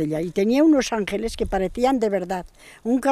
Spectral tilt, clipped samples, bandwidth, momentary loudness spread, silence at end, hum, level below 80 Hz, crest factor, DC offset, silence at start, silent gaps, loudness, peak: -5.5 dB/octave; under 0.1%; 13.5 kHz; 10 LU; 0 s; none; -42 dBFS; 14 dB; under 0.1%; 0 s; none; -22 LUFS; -6 dBFS